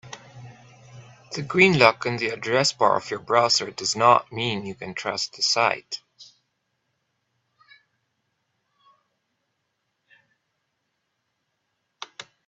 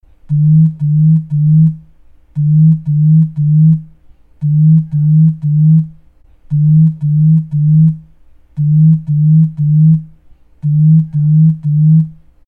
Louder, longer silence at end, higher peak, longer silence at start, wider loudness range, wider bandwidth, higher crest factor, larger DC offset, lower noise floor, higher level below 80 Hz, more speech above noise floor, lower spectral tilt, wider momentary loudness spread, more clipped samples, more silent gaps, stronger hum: second, -21 LUFS vs -11 LUFS; about the same, 0.25 s vs 0.35 s; about the same, 0 dBFS vs -2 dBFS; second, 0.05 s vs 0.3 s; first, 9 LU vs 1 LU; first, 8.6 kHz vs 0.5 kHz; first, 26 dB vs 8 dB; neither; first, -77 dBFS vs -43 dBFS; second, -66 dBFS vs -46 dBFS; first, 54 dB vs 34 dB; second, -3.5 dB/octave vs -14 dB/octave; first, 20 LU vs 8 LU; neither; neither; neither